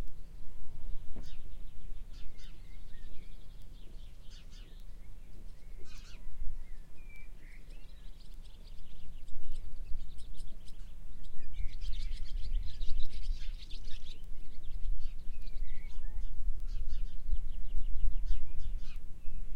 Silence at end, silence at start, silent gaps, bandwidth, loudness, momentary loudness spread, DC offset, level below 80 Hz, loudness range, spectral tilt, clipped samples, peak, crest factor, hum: 0 s; 0 s; none; 5.2 kHz; -48 LUFS; 12 LU; under 0.1%; -38 dBFS; 11 LU; -5.5 dB/octave; under 0.1%; -12 dBFS; 14 dB; none